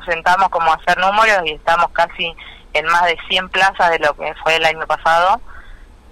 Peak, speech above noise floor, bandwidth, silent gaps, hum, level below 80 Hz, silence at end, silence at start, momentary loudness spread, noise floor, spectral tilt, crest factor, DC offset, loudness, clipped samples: -4 dBFS; 23 dB; 16 kHz; none; none; -40 dBFS; 0.35 s; 0 s; 6 LU; -38 dBFS; -2.5 dB/octave; 12 dB; under 0.1%; -15 LUFS; under 0.1%